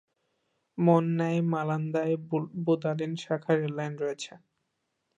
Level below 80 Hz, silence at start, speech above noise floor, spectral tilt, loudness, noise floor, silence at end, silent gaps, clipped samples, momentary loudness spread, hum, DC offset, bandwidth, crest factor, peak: -78 dBFS; 0.75 s; 52 dB; -7.5 dB/octave; -29 LUFS; -80 dBFS; 0.8 s; none; under 0.1%; 10 LU; none; under 0.1%; 8.6 kHz; 20 dB; -10 dBFS